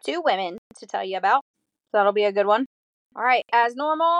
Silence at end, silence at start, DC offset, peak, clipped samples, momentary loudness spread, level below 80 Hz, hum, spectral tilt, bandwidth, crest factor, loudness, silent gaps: 0 s; 0.05 s; under 0.1%; -6 dBFS; under 0.1%; 13 LU; -82 dBFS; none; -4 dB/octave; 11 kHz; 16 dB; -22 LUFS; 0.58-0.70 s, 1.41-1.54 s, 2.66-3.10 s